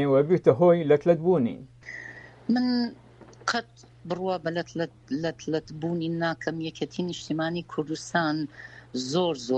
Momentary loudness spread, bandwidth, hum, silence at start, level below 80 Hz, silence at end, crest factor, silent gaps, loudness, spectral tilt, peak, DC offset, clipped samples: 16 LU; 8.8 kHz; none; 0 s; -62 dBFS; 0 s; 22 dB; none; -27 LUFS; -6 dB/octave; -6 dBFS; under 0.1%; under 0.1%